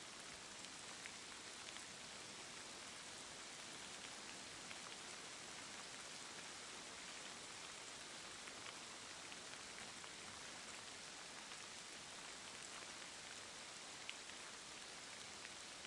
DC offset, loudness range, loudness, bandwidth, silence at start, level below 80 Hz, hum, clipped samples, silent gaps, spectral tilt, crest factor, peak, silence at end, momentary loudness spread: under 0.1%; 1 LU; -52 LUFS; 12 kHz; 0 s; -82 dBFS; none; under 0.1%; none; -0.5 dB/octave; 24 dB; -30 dBFS; 0 s; 1 LU